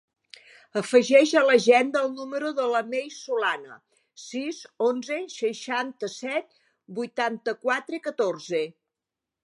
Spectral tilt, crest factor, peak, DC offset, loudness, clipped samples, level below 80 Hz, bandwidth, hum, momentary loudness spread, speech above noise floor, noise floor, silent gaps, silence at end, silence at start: -3.5 dB/octave; 20 dB; -6 dBFS; under 0.1%; -25 LUFS; under 0.1%; -84 dBFS; 11.5 kHz; none; 15 LU; 63 dB; -88 dBFS; none; 0.75 s; 0.75 s